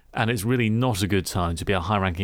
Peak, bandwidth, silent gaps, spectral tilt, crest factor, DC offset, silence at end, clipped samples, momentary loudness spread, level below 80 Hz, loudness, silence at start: -8 dBFS; 17 kHz; none; -5.5 dB/octave; 16 dB; under 0.1%; 0 s; under 0.1%; 3 LU; -42 dBFS; -24 LUFS; 0.15 s